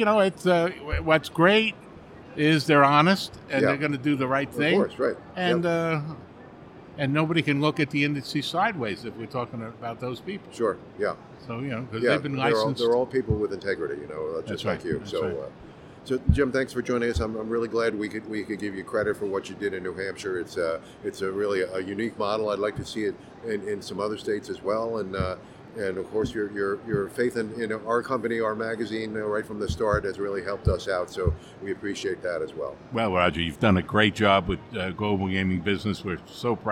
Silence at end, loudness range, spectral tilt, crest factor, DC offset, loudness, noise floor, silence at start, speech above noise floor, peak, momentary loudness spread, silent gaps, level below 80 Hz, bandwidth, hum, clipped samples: 0 s; 7 LU; -6 dB/octave; 22 dB; under 0.1%; -26 LUFS; -46 dBFS; 0 s; 20 dB; -4 dBFS; 11 LU; none; -44 dBFS; 16 kHz; none; under 0.1%